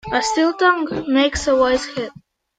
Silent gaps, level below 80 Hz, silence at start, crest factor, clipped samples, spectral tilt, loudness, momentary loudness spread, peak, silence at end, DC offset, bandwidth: none; -42 dBFS; 0.05 s; 16 dB; under 0.1%; -3.5 dB/octave; -18 LUFS; 11 LU; -2 dBFS; 0.5 s; under 0.1%; 9.4 kHz